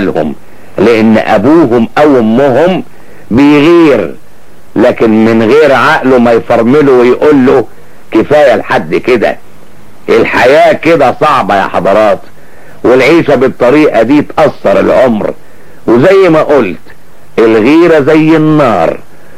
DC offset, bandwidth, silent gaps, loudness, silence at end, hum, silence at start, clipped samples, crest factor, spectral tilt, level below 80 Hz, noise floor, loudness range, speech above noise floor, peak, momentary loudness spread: 6%; 15 kHz; none; -6 LUFS; 0.4 s; none; 0 s; 1%; 6 dB; -7 dB/octave; -40 dBFS; -39 dBFS; 2 LU; 33 dB; 0 dBFS; 9 LU